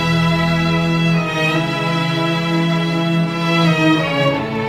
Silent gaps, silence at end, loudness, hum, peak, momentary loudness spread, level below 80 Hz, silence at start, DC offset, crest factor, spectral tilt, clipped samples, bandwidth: none; 0 s; -16 LUFS; none; -4 dBFS; 3 LU; -42 dBFS; 0 s; under 0.1%; 14 dB; -6 dB/octave; under 0.1%; 12.5 kHz